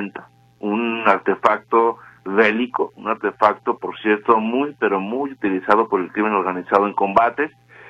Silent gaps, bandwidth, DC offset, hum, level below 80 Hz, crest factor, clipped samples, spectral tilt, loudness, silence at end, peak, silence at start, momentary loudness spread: none; 8 kHz; under 0.1%; none; -62 dBFS; 20 dB; under 0.1%; -7 dB/octave; -19 LUFS; 0 s; 0 dBFS; 0 s; 8 LU